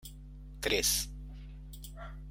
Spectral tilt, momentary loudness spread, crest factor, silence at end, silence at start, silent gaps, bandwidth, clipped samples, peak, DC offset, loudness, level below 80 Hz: -1.5 dB/octave; 22 LU; 22 dB; 0 s; 0 s; none; 16.5 kHz; under 0.1%; -16 dBFS; under 0.1%; -31 LUFS; -46 dBFS